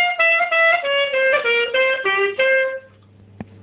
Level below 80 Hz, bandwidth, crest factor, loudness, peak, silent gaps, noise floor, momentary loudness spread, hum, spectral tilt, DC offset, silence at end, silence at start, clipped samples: -62 dBFS; 4 kHz; 12 dB; -16 LUFS; -6 dBFS; none; -47 dBFS; 4 LU; none; -5 dB/octave; under 0.1%; 0.2 s; 0 s; under 0.1%